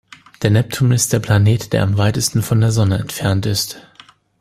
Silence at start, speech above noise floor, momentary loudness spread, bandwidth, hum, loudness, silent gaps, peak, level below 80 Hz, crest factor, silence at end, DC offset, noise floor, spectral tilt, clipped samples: 0.4 s; 32 dB; 6 LU; 15.5 kHz; none; -16 LUFS; none; 0 dBFS; -44 dBFS; 16 dB; 0.6 s; under 0.1%; -47 dBFS; -5 dB/octave; under 0.1%